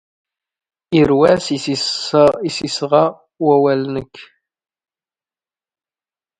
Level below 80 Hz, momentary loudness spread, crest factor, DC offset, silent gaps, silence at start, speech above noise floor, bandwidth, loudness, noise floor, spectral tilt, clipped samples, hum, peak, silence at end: -50 dBFS; 8 LU; 18 dB; under 0.1%; none; 0.9 s; over 75 dB; 10.5 kHz; -15 LUFS; under -90 dBFS; -5.5 dB/octave; under 0.1%; none; 0 dBFS; 2.15 s